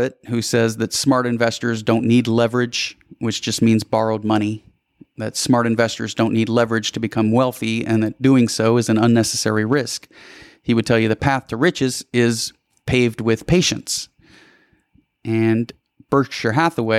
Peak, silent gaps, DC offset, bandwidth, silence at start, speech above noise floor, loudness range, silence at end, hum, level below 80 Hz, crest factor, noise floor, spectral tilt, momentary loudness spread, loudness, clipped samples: -4 dBFS; none; under 0.1%; 15 kHz; 0 s; 42 dB; 3 LU; 0 s; none; -48 dBFS; 16 dB; -60 dBFS; -5 dB/octave; 9 LU; -19 LUFS; under 0.1%